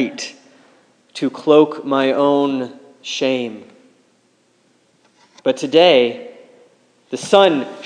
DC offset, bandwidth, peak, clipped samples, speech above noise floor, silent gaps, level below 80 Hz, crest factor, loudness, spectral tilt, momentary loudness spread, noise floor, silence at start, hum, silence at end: under 0.1%; 10 kHz; 0 dBFS; under 0.1%; 43 dB; none; -72 dBFS; 18 dB; -16 LUFS; -4.5 dB/octave; 19 LU; -59 dBFS; 0 s; none; 0 s